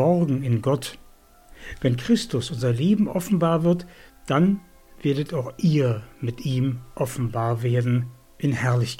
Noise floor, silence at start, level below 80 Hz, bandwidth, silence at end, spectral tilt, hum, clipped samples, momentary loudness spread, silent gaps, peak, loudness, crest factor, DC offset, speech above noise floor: -50 dBFS; 0 s; -50 dBFS; 16 kHz; 0 s; -7 dB/octave; none; under 0.1%; 9 LU; none; -8 dBFS; -24 LUFS; 16 dB; under 0.1%; 28 dB